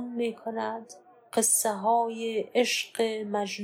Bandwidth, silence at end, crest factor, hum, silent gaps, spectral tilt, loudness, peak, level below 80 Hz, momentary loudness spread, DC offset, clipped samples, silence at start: 16.5 kHz; 0 s; 16 dB; none; none; -2 dB/octave; -27 LUFS; -12 dBFS; -86 dBFS; 10 LU; under 0.1%; under 0.1%; 0 s